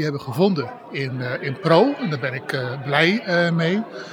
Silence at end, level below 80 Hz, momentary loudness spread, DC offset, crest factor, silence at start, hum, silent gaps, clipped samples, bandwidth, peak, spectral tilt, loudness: 0 s; -72 dBFS; 10 LU; under 0.1%; 20 dB; 0 s; none; none; under 0.1%; 17 kHz; -2 dBFS; -6.5 dB/octave; -21 LUFS